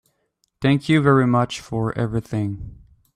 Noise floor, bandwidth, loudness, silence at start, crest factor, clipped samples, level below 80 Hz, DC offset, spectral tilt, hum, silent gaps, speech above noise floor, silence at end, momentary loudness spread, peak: -70 dBFS; 11 kHz; -20 LUFS; 0.6 s; 18 dB; under 0.1%; -46 dBFS; under 0.1%; -7 dB/octave; none; none; 50 dB; 0.4 s; 12 LU; -4 dBFS